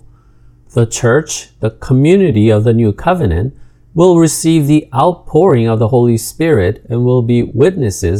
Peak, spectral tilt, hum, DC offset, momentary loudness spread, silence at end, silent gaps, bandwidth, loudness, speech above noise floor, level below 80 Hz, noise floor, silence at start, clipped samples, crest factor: 0 dBFS; -6.5 dB/octave; none; under 0.1%; 9 LU; 0 s; none; 14.5 kHz; -12 LUFS; 32 dB; -36 dBFS; -43 dBFS; 0.75 s; 0.1%; 12 dB